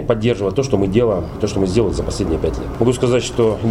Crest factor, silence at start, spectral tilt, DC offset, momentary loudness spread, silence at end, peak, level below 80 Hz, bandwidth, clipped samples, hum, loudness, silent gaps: 16 dB; 0 s; -6.5 dB/octave; under 0.1%; 5 LU; 0 s; 0 dBFS; -32 dBFS; 13.5 kHz; under 0.1%; none; -18 LUFS; none